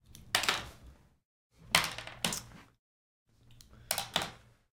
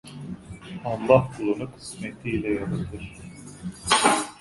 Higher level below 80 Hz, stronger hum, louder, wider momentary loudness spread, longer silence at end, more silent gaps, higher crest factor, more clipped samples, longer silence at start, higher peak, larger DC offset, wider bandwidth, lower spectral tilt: second, -60 dBFS vs -50 dBFS; neither; second, -33 LUFS vs -24 LUFS; second, 13 LU vs 20 LU; first, 0.35 s vs 0 s; first, 1.25-1.50 s, 2.79-3.26 s vs none; first, 32 dB vs 24 dB; neither; about the same, 0.1 s vs 0.05 s; second, -6 dBFS vs -2 dBFS; neither; first, 18 kHz vs 11.5 kHz; second, -1 dB/octave vs -4 dB/octave